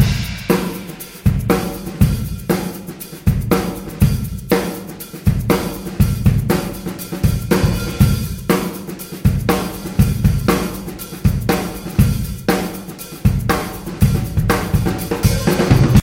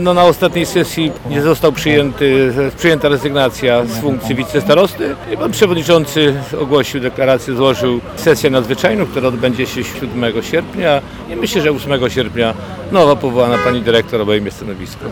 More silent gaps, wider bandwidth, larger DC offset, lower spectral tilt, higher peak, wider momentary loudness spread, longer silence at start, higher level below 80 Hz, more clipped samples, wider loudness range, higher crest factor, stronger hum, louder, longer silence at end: neither; second, 17 kHz vs 19 kHz; neither; about the same, -6 dB/octave vs -5.5 dB/octave; about the same, 0 dBFS vs 0 dBFS; first, 10 LU vs 7 LU; about the same, 0 s vs 0 s; first, -26 dBFS vs -38 dBFS; neither; about the same, 2 LU vs 3 LU; about the same, 16 dB vs 12 dB; neither; second, -18 LUFS vs -14 LUFS; about the same, 0 s vs 0 s